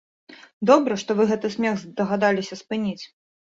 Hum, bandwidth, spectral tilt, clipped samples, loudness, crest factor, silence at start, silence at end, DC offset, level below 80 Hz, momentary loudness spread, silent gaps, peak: none; 7.8 kHz; -5.5 dB/octave; under 0.1%; -22 LUFS; 20 dB; 0.3 s; 0.55 s; under 0.1%; -66 dBFS; 11 LU; 0.53-0.61 s; -2 dBFS